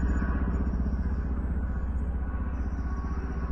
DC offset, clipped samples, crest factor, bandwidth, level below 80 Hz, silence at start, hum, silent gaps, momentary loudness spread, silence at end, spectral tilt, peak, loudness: under 0.1%; under 0.1%; 12 dB; 6 kHz; -30 dBFS; 0 s; none; none; 4 LU; 0 s; -9.5 dB/octave; -16 dBFS; -32 LUFS